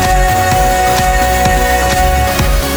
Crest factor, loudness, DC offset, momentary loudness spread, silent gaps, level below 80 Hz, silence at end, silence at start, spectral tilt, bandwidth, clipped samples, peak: 10 dB; -11 LUFS; under 0.1%; 1 LU; none; -16 dBFS; 0 s; 0 s; -4 dB/octave; over 20 kHz; under 0.1%; 0 dBFS